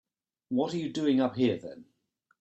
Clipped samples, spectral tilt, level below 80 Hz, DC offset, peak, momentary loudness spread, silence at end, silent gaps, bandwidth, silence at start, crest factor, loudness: under 0.1%; -6.5 dB/octave; -70 dBFS; under 0.1%; -14 dBFS; 9 LU; 0.6 s; none; 8.2 kHz; 0.5 s; 16 dB; -29 LUFS